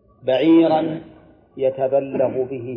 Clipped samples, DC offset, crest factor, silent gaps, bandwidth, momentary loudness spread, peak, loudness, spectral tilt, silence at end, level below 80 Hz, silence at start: under 0.1%; under 0.1%; 14 dB; none; 5.2 kHz; 11 LU; -6 dBFS; -19 LUFS; -9.5 dB/octave; 0 s; -60 dBFS; 0.25 s